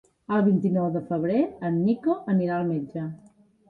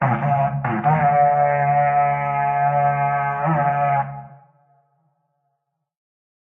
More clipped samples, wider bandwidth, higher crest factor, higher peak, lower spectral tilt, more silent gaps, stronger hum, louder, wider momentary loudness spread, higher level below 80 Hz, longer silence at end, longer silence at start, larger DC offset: neither; first, 4.7 kHz vs 3.3 kHz; about the same, 14 dB vs 14 dB; second, -12 dBFS vs -6 dBFS; about the same, -10.5 dB/octave vs -10.5 dB/octave; neither; neither; second, -25 LUFS vs -19 LUFS; first, 8 LU vs 5 LU; second, -64 dBFS vs -56 dBFS; second, 0.55 s vs 2.15 s; first, 0.3 s vs 0 s; neither